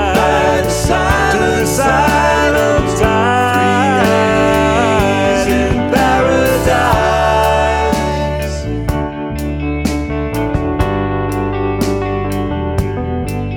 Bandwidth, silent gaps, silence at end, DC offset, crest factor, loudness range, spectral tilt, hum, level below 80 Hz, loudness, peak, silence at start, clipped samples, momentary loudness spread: 17.5 kHz; none; 0 s; under 0.1%; 12 dB; 6 LU; -5.5 dB/octave; none; -24 dBFS; -14 LUFS; 0 dBFS; 0 s; under 0.1%; 7 LU